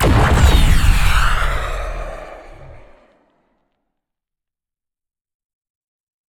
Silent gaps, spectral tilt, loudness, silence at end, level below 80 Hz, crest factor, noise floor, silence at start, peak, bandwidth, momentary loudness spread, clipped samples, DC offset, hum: none; -5 dB/octave; -16 LUFS; 3.55 s; -20 dBFS; 16 dB; -85 dBFS; 0 s; 0 dBFS; 18.5 kHz; 20 LU; under 0.1%; under 0.1%; none